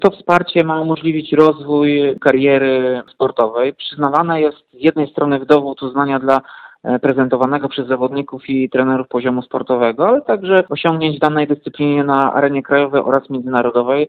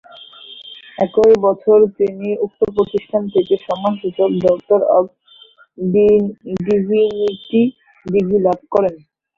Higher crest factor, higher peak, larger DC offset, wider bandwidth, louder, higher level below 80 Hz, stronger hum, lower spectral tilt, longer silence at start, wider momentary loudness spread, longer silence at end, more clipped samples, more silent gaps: about the same, 14 dB vs 14 dB; about the same, 0 dBFS vs -2 dBFS; neither; about the same, 7 kHz vs 7 kHz; about the same, -15 LUFS vs -16 LUFS; about the same, -56 dBFS vs -52 dBFS; neither; about the same, -8 dB/octave vs -8 dB/octave; second, 0 s vs 0.4 s; second, 6 LU vs 12 LU; second, 0 s vs 0.4 s; neither; neither